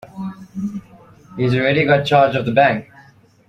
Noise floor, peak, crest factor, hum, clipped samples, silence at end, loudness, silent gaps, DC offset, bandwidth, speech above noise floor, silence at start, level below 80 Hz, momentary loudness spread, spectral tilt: -49 dBFS; -2 dBFS; 16 dB; none; under 0.1%; 0.65 s; -17 LUFS; none; under 0.1%; 10.5 kHz; 33 dB; 0.05 s; -54 dBFS; 17 LU; -7 dB/octave